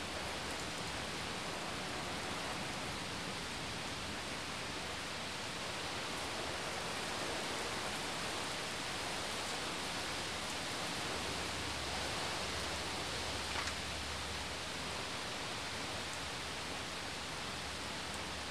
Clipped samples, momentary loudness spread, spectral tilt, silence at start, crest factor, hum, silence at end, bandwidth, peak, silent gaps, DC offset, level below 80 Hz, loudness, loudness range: under 0.1%; 3 LU; -2.5 dB/octave; 0 s; 18 dB; none; 0 s; 15 kHz; -24 dBFS; none; 0.1%; -56 dBFS; -40 LUFS; 2 LU